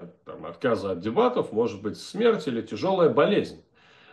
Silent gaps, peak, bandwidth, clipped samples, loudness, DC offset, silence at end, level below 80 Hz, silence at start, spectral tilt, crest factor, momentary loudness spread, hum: none; -8 dBFS; 11.5 kHz; under 0.1%; -25 LUFS; under 0.1%; 0.55 s; -66 dBFS; 0 s; -6.5 dB/octave; 16 dB; 15 LU; none